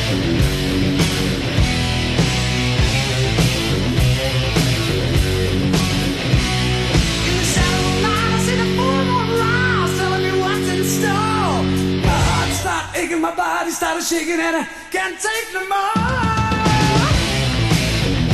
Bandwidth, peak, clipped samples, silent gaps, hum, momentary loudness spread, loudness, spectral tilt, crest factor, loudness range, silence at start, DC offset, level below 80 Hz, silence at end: 13 kHz; -2 dBFS; under 0.1%; none; none; 4 LU; -18 LUFS; -4.5 dB/octave; 16 dB; 2 LU; 0 s; under 0.1%; -26 dBFS; 0 s